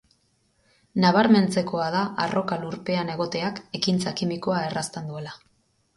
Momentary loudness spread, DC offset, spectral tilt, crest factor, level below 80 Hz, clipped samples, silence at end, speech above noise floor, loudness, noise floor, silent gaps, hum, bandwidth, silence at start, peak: 13 LU; under 0.1%; -5.5 dB/octave; 20 dB; -62 dBFS; under 0.1%; 0.6 s; 43 dB; -24 LUFS; -67 dBFS; none; none; 11.5 kHz; 0.95 s; -6 dBFS